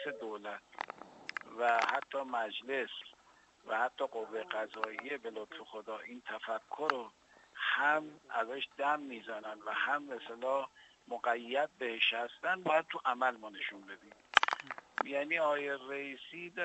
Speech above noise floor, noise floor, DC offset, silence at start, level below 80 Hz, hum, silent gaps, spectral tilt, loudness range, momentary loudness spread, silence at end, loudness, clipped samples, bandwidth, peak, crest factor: 28 dB; -65 dBFS; under 0.1%; 0 s; -84 dBFS; none; none; -2.5 dB/octave; 6 LU; 14 LU; 0 s; -36 LUFS; under 0.1%; 8.2 kHz; -4 dBFS; 34 dB